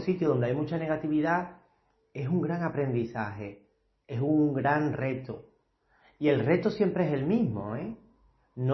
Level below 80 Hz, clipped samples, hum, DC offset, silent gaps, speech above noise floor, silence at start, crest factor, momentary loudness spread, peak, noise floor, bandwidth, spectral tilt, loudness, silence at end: -62 dBFS; under 0.1%; none; under 0.1%; none; 41 dB; 0 s; 18 dB; 16 LU; -10 dBFS; -69 dBFS; 6.2 kHz; -9.5 dB/octave; -29 LUFS; 0 s